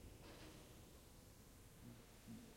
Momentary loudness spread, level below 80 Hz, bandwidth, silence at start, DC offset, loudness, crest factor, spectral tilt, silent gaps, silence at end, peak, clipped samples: 5 LU; -68 dBFS; 16.5 kHz; 0 s; under 0.1%; -62 LUFS; 14 dB; -4.5 dB/octave; none; 0 s; -46 dBFS; under 0.1%